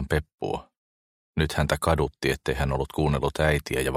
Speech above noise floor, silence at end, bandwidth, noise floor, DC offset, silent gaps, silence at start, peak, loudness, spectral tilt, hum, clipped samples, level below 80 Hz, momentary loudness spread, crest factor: over 65 dB; 0 s; 16 kHz; under -90 dBFS; under 0.1%; 0.34-0.38 s, 0.77-1.34 s; 0 s; -6 dBFS; -26 LUFS; -5.5 dB/octave; none; under 0.1%; -36 dBFS; 9 LU; 20 dB